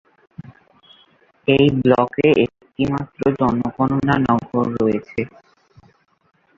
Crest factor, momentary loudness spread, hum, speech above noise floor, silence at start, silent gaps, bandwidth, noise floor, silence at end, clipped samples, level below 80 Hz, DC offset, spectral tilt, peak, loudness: 18 dB; 9 LU; none; 39 dB; 0.4 s; none; 7.4 kHz; -56 dBFS; 1.3 s; under 0.1%; -48 dBFS; under 0.1%; -8.5 dB/octave; -2 dBFS; -18 LUFS